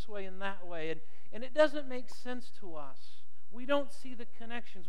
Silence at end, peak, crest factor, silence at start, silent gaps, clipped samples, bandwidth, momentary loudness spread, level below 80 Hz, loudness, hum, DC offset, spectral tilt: 0 s; -12 dBFS; 24 dB; 0 s; none; under 0.1%; 12.5 kHz; 20 LU; -88 dBFS; -37 LUFS; none; 4%; -5.5 dB/octave